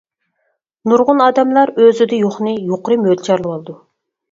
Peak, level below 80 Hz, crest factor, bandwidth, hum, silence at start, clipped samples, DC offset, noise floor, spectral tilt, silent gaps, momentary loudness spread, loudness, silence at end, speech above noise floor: 0 dBFS; -62 dBFS; 14 dB; 7.6 kHz; none; 0.85 s; under 0.1%; under 0.1%; -68 dBFS; -6.5 dB/octave; none; 13 LU; -14 LUFS; 0.55 s; 55 dB